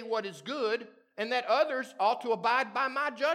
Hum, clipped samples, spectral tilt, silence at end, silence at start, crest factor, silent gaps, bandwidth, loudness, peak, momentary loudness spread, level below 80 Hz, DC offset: none; under 0.1%; -3.5 dB/octave; 0 s; 0 s; 16 dB; none; 14 kHz; -30 LUFS; -14 dBFS; 8 LU; under -90 dBFS; under 0.1%